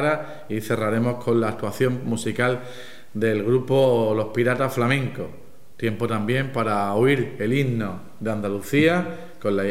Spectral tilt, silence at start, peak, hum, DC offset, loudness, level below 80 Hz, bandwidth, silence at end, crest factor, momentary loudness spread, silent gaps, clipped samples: -6.5 dB/octave; 0 s; -6 dBFS; none; 1%; -23 LUFS; -62 dBFS; 16 kHz; 0 s; 16 dB; 11 LU; none; under 0.1%